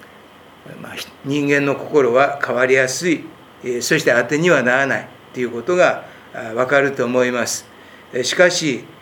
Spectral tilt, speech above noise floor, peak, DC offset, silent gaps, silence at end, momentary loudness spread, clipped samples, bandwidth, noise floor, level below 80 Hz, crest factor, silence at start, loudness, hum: -4 dB/octave; 26 dB; 0 dBFS; under 0.1%; none; 0.1 s; 15 LU; under 0.1%; 19.5 kHz; -44 dBFS; -66 dBFS; 18 dB; 0 s; -17 LUFS; none